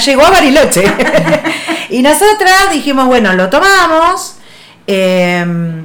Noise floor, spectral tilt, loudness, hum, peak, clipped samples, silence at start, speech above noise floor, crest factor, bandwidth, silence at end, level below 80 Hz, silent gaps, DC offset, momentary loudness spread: -37 dBFS; -4 dB/octave; -8 LUFS; none; 0 dBFS; 0.2%; 0 s; 29 dB; 8 dB; over 20 kHz; 0 s; -34 dBFS; none; under 0.1%; 10 LU